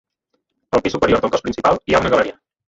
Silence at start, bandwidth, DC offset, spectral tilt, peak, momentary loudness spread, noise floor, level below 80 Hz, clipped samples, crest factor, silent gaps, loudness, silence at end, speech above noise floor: 0.75 s; 8 kHz; under 0.1%; -5.5 dB/octave; -2 dBFS; 5 LU; -72 dBFS; -42 dBFS; under 0.1%; 16 dB; none; -17 LUFS; 0.4 s; 55 dB